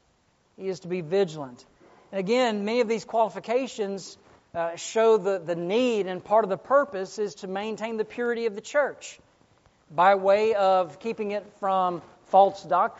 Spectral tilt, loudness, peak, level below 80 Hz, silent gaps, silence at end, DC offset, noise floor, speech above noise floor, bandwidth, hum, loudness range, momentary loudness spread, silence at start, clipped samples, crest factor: -3.5 dB/octave; -25 LUFS; -6 dBFS; -72 dBFS; none; 0 s; under 0.1%; -66 dBFS; 41 dB; 8 kHz; none; 4 LU; 13 LU; 0.6 s; under 0.1%; 20 dB